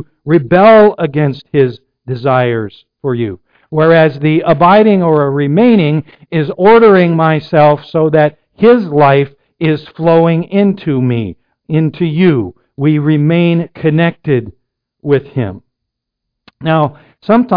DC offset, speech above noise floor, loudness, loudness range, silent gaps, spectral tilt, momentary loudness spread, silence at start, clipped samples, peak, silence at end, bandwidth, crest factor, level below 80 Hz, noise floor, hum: under 0.1%; 66 dB; -11 LUFS; 6 LU; none; -10.5 dB/octave; 12 LU; 0 s; under 0.1%; 0 dBFS; 0 s; 5.2 kHz; 10 dB; -48 dBFS; -76 dBFS; none